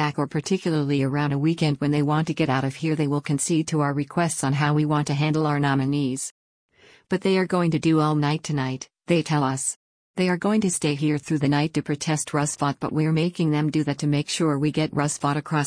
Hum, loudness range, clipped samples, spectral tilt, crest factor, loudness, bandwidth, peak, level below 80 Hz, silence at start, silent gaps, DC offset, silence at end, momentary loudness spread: none; 1 LU; under 0.1%; -5.5 dB/octave; 14 dB; -23 LUFS; 10.5 kHz; -8 dBFS; -60 dBFS; 0 s; 6.31-6.69 s, 9.76-10.14 s; under 0.1%; 0 s; 4 LU